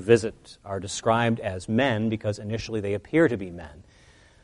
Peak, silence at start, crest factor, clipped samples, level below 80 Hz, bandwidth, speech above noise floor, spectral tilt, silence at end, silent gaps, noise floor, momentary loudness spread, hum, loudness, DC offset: -4 dBFS; 0 s; 22 dB; under 0.1%; -54 dBFS; 11 kHz; 30 dB; -5.5 dB/octave; 0.6 s; none; -55 dBFS; 14 LU; none; -26 LUFS; under 0.1%